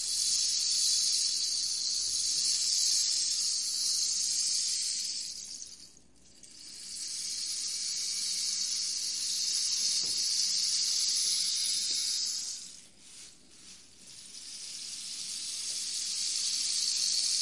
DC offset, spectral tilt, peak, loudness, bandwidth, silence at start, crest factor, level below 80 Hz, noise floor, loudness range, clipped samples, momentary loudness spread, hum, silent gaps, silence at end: 0.1%; 3.5 dB/octave; -12 dBFS; -28 LUFS; 11.5 kHz; 0 s; 20 dB; -72 dBFS; -60 dBFS; 9 LU; under 0.1%; 15 LU; none; none; 0 s